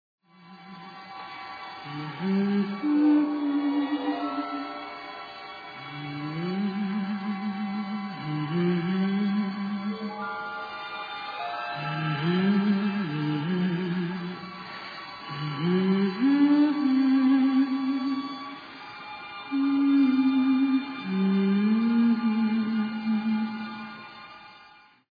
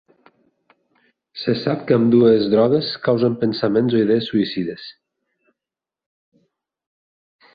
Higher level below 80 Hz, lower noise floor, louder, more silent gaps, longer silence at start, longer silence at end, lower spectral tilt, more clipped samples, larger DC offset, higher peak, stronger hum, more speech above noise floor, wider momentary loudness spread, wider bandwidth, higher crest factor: second, -72 dBFS vs -60 dBFS; second, -54 dBFS vs -88 dBFS; second, -26 LUFS vs -18 LUFS; neither; second, 0.45 s vs 1.35 s; second, 0.5 s vs 2.65 s; about the same, -9 dB/octave vs -9.5 dB/octave; neither; neither; second, -12 dBFS vs -4 dBFS; neither; second, 30 dB vs 71 dB; first, 17 LU vs 13 LU; about the same, 5 kHz vs 5 kHz; about the same, 14 dB vs 18 dB